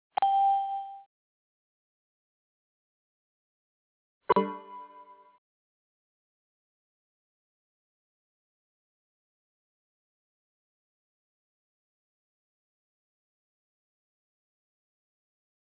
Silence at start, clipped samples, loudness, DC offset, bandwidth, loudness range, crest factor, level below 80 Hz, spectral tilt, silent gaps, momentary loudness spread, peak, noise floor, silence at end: 0.2 s; under 0.1%; -28 LUFS; under 0.1%; 4 kHz; 13 LU; 28 dB; -80 dBFS; -4 dB/octave; 1.06-4.21 s; 24 LU; -10 dBFS; -54 dBFS; 10.65 s